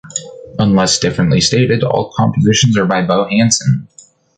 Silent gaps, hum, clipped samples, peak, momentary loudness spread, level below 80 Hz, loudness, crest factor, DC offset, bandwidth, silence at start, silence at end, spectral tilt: none; none; under 0.1%; 0 dBFS; 7 LU; -42 dBFS; -13 LUFS; 14 dB; under 0.1%; 9.6 kHz; 0.05 s; 0.55 s; -4.5 dB/octave